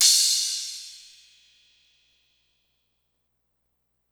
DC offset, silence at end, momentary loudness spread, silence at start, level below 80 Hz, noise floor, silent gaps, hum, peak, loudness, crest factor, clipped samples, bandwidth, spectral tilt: under 0.1%; 3.15 s; 25 LU; 0 s; -80 dBFS; -75 dBFS; none; 60 Hz at -80 dBFS; -4 dBFS; -21 LUFS; 26 dB; under 0.1%; over 20 kHz; 7.5 dB/octave